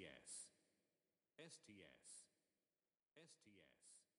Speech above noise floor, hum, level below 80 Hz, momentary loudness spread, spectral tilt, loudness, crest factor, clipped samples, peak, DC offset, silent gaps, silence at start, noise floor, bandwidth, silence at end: over 22 dB; none; under -90 dBFS; 12 LU; -2 dB/octave; -62 LUFS; 22 dB; under 0.1%; -44 dBFS; under 0.1%; none; 0 s; under -90 dBFS; 11 kHz; 0.15 s